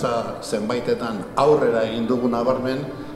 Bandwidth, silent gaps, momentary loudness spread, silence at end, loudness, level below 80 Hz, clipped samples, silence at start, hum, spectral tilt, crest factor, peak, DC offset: 13 kHz; none; 8 LU; 0 s; -22 LUFS; -50 dBFS; under 0.1%; 0 s; none; -6 dB/octave; 18 dB; -4 dBFS; under 0.1%